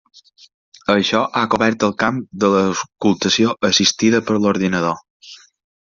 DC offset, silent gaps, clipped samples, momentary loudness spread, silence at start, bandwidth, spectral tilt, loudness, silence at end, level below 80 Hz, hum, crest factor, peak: under 0.1%; 5.10-5.20 s; under 0.1%; 6 LU; 0.9 s; 7.6 kHz; -4 dB/octave; -17 LUFS; 0.55 s; -56 dBFS; none; 16 dB; -2 dBFS